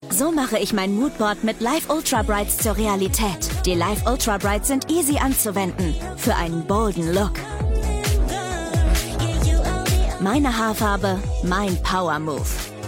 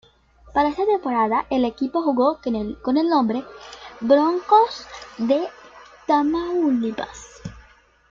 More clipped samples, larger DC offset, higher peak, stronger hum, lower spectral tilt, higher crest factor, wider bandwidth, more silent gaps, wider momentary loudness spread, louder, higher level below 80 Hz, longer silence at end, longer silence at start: neither; neither; about the same, -4 dBFS vs -4 dBFS; neither; second, -4.5 dB/octave vs -6 dB/octave; about the same, 16 dB vs 18 dB; first, 17 kHz vs 7.6 kHz; neither; second, 4 LU vs 20 LU; about the same, -21 LUFS vs -21 LUFS; first, -26 dBFS vs -52 dBFS; second, 0 s vs 0.5 s; second, 0 s vs 0.45 s